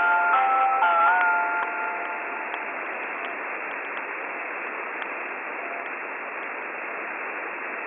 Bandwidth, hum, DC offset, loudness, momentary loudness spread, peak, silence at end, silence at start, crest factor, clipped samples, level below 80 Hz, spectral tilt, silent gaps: 3.8 kHz; none; under 0.1%; -26 LUFS; 12 LU; -10 dBFS; 0 s; 0 s; 16 dB; under 0.1%; -86 dBFS; 1 dB/octave; none